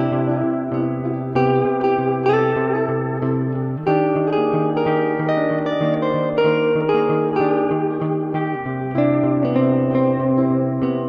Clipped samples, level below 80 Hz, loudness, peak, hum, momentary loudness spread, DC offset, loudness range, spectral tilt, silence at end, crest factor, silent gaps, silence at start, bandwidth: under 0.1%; -56 dBFS; -19 LUFS; -6 dBFS; none; 5 LU; under 0.1%; 1 LU; -9.5 dB/octave; 0 s; 14 dB; none; 0 s; 6 kHz